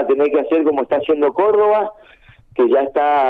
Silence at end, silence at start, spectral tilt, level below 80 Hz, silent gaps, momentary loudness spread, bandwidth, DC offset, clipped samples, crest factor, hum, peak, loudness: 0 s; 0 s; -7.5 dB/octave; -56 dBFS; none; 5 LU; 4.1 kHz; under 0.1%; under 0.1%; 12 dB; none; -4 dBFS; -16 LUFS